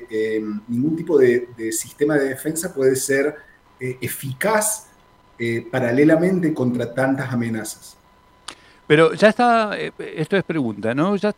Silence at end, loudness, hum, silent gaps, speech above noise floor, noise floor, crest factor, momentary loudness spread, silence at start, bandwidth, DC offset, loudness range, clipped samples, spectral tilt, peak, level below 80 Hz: 0.05 s; -20 LUFS; none; none; 34 dB; -53 dBFS; 20 dB; 13 LU; 0 s; 16 kHz; under 0.1%; 3 LU; under 0.1%; -5 dB/octave; 0 dBFS; -60 dBFS